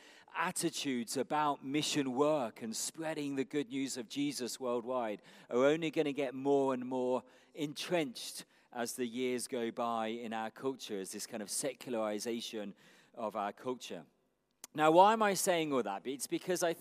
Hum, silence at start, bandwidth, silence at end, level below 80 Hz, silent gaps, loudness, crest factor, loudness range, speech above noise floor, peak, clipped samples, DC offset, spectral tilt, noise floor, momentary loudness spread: none; 0.05 s; 15.5 kHz; 0 s; -90 dBFS; none; -35 LUFS; 24 dB; 7 LU; 24 dB; -12 dBFS; under 0.1%; under 0.1%; -3.5 dB/octave; -59 dBFS; 12 LU